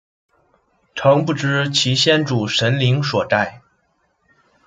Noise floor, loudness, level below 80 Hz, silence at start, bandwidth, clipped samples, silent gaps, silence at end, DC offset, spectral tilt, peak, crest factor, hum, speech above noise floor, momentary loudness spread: -65 dBFS; -17 LUFS; -58 dBFS; 0.95 s; 9.2 kHz; under 0.1%; none; 1.1 s; under 0.1%; -4.5 dB/octave; -2 dBFS; 18 dB; none; 48 dB; 5 LU